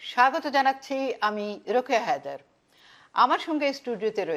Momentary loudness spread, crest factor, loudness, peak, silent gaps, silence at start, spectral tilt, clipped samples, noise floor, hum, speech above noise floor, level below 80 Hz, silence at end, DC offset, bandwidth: 9 LU; 20 dB; -26 LUFS; -8 dBFS; none; 0 s; -3.5 dB/octave; under 0.1%; -57 dBFS; none; 32 dB; -80 dBFS; 0 s; under 0.1%; 14.5 kHz